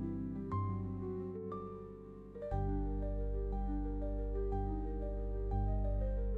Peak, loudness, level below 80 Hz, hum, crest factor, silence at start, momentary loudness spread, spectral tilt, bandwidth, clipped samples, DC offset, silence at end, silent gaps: -26 dBFS; -40 LUFS; -40 dBFS; 50 Hz at -55 dBFS; 12 dB; 0 s; 8 LU; -11.5 dB/octave; 2.4 kHz; under 0.1%; under 0.1%; 0 s; none